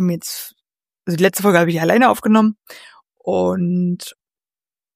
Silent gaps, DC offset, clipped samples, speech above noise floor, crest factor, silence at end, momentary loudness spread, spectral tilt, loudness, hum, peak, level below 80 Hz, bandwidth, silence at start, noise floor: none; under 0.1%; under 0.1%; over 74 dB; 18 dB; 0.85 s; 17 LU; -5.5 dB/octave; -17 LUFS; none; 0 dBFS; -62 dBFS; 15.5 kHz; 0 s; under -90 dBFS